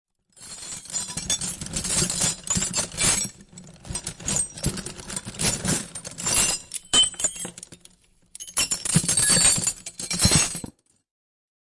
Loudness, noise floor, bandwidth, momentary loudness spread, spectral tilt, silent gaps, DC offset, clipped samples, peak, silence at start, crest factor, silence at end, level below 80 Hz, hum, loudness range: -22 LUFS; -55 dBFS; 11.5 kHz; 16 LU; -1.5 dB/octave; none; under 0.1%; under 0.1%; -6 dBFS; 0.4 s; 20 dB; 0.95 s; -44 dBFS; none; 5 LU